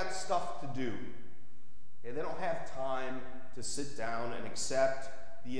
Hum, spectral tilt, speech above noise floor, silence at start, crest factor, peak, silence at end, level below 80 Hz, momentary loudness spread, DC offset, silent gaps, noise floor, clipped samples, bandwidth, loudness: none; -4 dB/octave; 27 dB; 0 s; 22 dB; -16 dBFS; 0 s; -64 dBFS; 17 LU; 3%; none; -65 dBFS; under 0.1%; 11 kHz; -38 LUFS